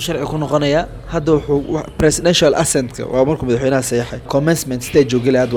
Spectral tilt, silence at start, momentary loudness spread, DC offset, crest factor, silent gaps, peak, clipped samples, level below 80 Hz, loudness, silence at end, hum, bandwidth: -5 dB/octave; 0 s; 8 LU; under 0.1%; 16 dB; none; 0 dBFS; under 0.1%; -36 dBFS; -16 LUFS; 0 s; none; over 20 kHz